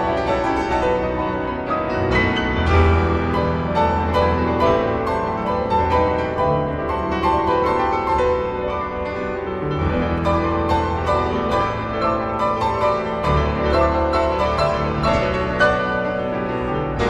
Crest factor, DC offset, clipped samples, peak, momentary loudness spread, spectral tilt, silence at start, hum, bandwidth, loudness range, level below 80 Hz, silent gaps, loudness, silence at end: 14 dB; under 0.1%; under 0.1%; -4 dBFS; 5 LU; -7 dB/octave; 0 s; none; 9.2 kHz; 2 LU; -32 dBFS; none; -20 LUFS; 0 s